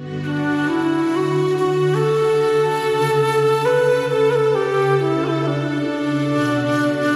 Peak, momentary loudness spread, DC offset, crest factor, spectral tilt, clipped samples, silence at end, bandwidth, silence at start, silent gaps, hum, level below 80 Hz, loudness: -6 dBFS; 4 LU; under 0.1%; 12 dB; -6.5 dB/octave; under 0.1%; 0 s; 14 kHz; 0 s; none; none; -58 dBFS; -18 LUFS